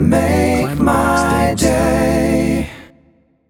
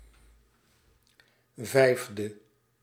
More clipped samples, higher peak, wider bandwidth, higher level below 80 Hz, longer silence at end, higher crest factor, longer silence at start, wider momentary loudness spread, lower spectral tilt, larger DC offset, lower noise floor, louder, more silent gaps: neither; first, -2 dBFS vs -8 dBFS; first, 18.5 kHz vs 16.5 kHz; first, -30 dBFS vs -66 dBFS; first, 0.65 s vs 0.5 s; second, 14 dB vs 24 dB; second, 0 s vs 1.6 s; second, 4 LU vs 16 LU; about the same, -6 dB/octave vs -5 dB/octave; neither; second, -54 dBFS vs -66 dBFS; first, -15 LUFS vs -27 LUFS; neither